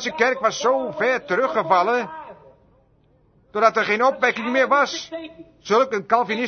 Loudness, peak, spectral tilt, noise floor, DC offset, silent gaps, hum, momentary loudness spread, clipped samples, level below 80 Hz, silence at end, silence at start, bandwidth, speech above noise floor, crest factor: -20 LUFS; -2 dBFS; -3.5 dB/octave; -59 dBFS; under 0.1%; none; none; 15 LU; under 0.1%; -64 dBFS; 0 s; 0 s; 6.6 kHz; 38 dB; 20 dB